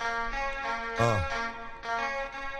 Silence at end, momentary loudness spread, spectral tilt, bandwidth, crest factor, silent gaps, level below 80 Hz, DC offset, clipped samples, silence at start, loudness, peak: 0 s; 7 LU; -5 dB/octave; 13 kHz; 20 dB; none; -46 dBFS; under 0.1%; under 0.1%; 0 s; -31 LUFS; -10 dBFS